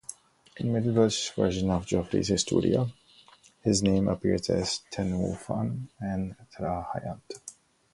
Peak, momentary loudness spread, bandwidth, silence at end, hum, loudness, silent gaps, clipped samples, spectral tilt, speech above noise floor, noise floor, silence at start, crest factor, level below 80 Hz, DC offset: -10 dBFS; 12 LU; 11.5 kHz; 0.4 s; none; -28 LUFS; none; under 0.1%; -5.5 dB/octave; 30 dB; -57 dBFS; 0.1 s; 20 dB; -48 dBFS; under 0.1%